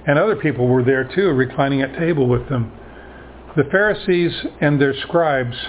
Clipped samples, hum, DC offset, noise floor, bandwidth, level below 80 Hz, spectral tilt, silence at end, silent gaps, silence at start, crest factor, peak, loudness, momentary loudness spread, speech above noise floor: under 0.1%; none; under 0.1%; -38 dBFS; 4 kHz; -44 dBFS; -11 dB/octave; 0 s; none; 0 s; 16 dB; -2 dBFS; -18 LUFS; 5 LU; 21 dB